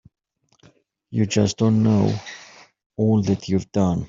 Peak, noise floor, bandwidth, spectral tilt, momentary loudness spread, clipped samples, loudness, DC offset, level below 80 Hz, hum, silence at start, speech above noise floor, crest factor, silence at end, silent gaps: -4 dBFS; -58 dBFS; 7.6 kHz; -7 dB/octave; 15 LU; under 0.1%; -21 LUFS; under 0.1%; -56 dBFS; none; 1.1 s; 38 dB; 18 dB; 0 s; 2.86-2.90 s